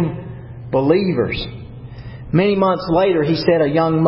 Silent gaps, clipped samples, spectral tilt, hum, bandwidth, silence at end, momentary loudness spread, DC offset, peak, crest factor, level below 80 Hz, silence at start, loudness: none; under 0.1%; -11.5 dB/octave; none; 5.8 kHz; 0 s; 19 LU; under 0.1%; -2 dBFS; 16 dB; -40 dBFS; 0 s; -17 LUFS